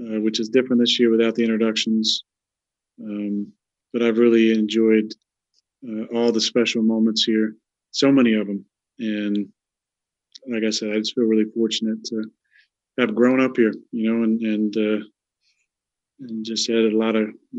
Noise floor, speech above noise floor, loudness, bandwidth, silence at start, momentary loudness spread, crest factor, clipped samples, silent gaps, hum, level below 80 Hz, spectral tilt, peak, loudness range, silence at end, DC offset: -87 dBFS; 66 dB; -20 LUFS; 8 kHz; 0 s; 14 LU; 18 dB; under 0.1%; none; none; -80 dBFS; -4.5 dB/octave; -2 dBFS; 4 LU; 0 s; under 0.1%